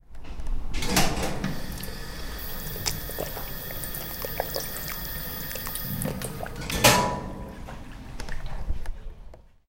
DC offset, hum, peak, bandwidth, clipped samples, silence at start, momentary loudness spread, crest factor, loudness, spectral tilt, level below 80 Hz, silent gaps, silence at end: under 0.1%; none; -2 dBFS; 17 kHz; under 0.1%; 0.1 s; 17 LU; 26 dB; -29 LUFS; -3 dB/octave; -36 dBFS; none; 0.2 s